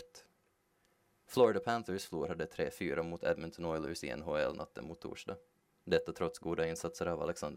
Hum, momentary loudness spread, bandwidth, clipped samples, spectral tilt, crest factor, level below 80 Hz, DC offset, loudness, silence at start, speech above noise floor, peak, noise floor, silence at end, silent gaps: none; 16 LU; 16 kHz; under 0.1%; -5 dB/octave; 22 dB; -66 dBFS; under 0.1%; -37 LUFS; 0 s; 39 dB; -14 dBFS; -76 dBFS; 0 s; none